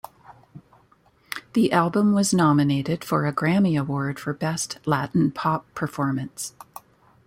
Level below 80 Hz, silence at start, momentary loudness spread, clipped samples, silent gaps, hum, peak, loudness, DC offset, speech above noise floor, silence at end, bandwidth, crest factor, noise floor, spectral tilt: -60 dBFS; 0.3 s; 15 LU; under 0.1%; none; none; -6 dBFS; -23 LUFS; under 0.1%; 37 dB; 0.75 s; 16.5 kHz; 18 dB; -59 dBFS; -5.5 dB/octave